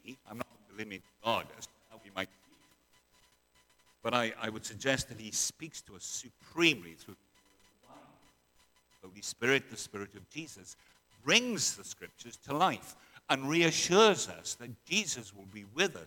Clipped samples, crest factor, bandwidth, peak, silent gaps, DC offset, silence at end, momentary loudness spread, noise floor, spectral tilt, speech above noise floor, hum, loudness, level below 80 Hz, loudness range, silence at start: under 0.1%; 28 dB; 19 kHz; -8 dBFS; none; under 0.1%; 0 s; 21 LU; -69 dBFS; -2.5 dB/octave; 36 dB; none; -32 LUFS; -70 dBFS; 10 LU; 0.05 s